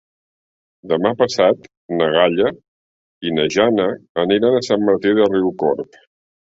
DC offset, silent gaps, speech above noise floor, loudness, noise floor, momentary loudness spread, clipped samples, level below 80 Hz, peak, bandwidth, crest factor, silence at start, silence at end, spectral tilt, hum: under 0.1%; 1.77-1.89 s, 2.68-3.21 s, 4.09-4.15 s; over 73 dB; -17 LUFS; under -90 dBFS; 8 LU; under 0.1%; -56 dBFS; -2 dBFS; 8 kHz; 16 dB; 0.85 s; 0.75 s; -5.5 dB/octave; none